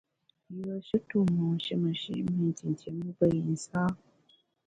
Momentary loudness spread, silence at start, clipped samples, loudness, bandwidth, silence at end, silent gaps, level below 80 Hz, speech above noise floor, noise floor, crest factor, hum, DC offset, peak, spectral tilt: 10 LU; 0.5 s; under 0.1%; -31 LUFS; 9.2 kHz; 0.7 s; none; -64 dBFS; 37 dB; -67 dBFS; 18 dB; none; under 0.1%; -12 dBFS; -7 dB/octave